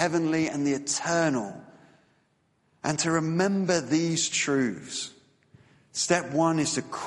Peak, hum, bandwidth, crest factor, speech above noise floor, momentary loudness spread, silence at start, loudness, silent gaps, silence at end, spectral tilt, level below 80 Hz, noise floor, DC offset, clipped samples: -8 dBFS; none; 11.5 kHz; 20 dB; 43 dB; 10 LU; 0 s; -26 LUFS; none; 0 s; -4 dB/octave; -68 dBFS; -69 dBFS; under 0.1%; under 0.1%